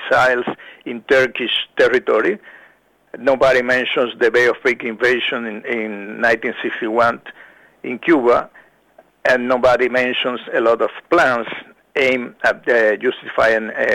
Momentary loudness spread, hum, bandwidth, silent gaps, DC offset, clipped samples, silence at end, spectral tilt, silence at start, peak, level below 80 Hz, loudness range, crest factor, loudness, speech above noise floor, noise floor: 10 LU; none; 13.5 kHz; none; under 0.1%; under 0.1%; 0 s; -4.5 dB/octave; 0 s; -2 dBFS; -52 dBFS; 2 LU; 16 dB; -17 LUFS; 36 dB; -53 dBFS